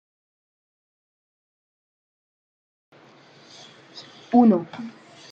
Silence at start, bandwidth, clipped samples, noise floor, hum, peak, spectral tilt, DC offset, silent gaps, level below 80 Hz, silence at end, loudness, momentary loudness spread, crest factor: 3.95 s; 7.2 kHz; under 0.1%; -51 dBFS; none; -6 dBFS; -7.5 dB/octave; under 0.1%; none; -78 dBFS; 0.4 s; -19 LUFS; 26 LU; 22 dB